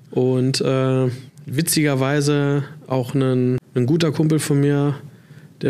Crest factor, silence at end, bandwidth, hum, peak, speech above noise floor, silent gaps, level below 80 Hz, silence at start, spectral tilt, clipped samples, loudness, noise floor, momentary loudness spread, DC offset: 14 dB; 0 s; 15 kHz; none; -6 dBFS; 26 dB; none; -60 dBFS; 0.1 s; -6 dB/octave; under 0.1%; -19 LUFS; -44 dBFS; 7 LU; under 0.1%